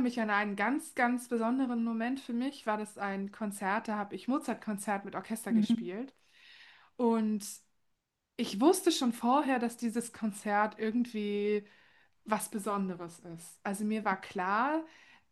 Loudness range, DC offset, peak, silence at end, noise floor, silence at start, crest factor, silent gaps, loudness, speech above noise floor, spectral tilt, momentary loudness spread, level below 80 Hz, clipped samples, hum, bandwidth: 4 LU; under 0.1%; -12 dBFS; 0.45 s; -81 dBFS; 0 s; 20 dB; none; -33 LUFS; 48 dB; -4.5 dB/octave; 10 LU; -80 dBFS; under 0.1%; none; 12.5 kHz